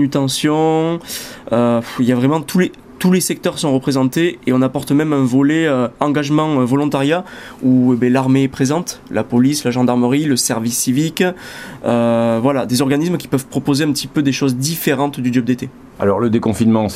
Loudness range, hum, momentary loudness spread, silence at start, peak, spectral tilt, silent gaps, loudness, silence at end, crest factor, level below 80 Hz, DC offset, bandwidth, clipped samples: 2 LU; none; 6 LU; 0 s; 0 dBFS; -5.5 dB/octave; none; -16 LUFS; 0 s; 14 dB; -50 dBFS; under 0.1%; 16 kHz; under 0.1%